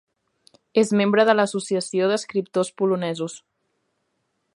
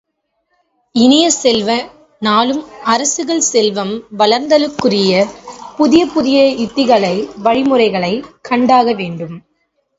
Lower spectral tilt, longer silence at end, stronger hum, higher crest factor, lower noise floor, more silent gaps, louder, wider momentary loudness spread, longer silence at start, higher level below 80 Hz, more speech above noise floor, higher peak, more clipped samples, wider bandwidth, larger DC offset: first, -5 dB/octave vs -3.5 dB/octave; first, 1.15 s vs 0.6 s; neither; first, 20 dB vs 14 dB; first, -73 dBFS vs -67 dBFS; neither; second, -22 LUFS vs -13 LUFS; about the same, 10 LU vs 10 LU; second, 0.75 s vs 0.95 s; second, -74 dBFS vs -52 dBFS; about the same, 52 dB vs 54 dB; second, -4 dBFS vs 0 dBFS; neither; first, 11.5 kHz vs 8 kHz; neither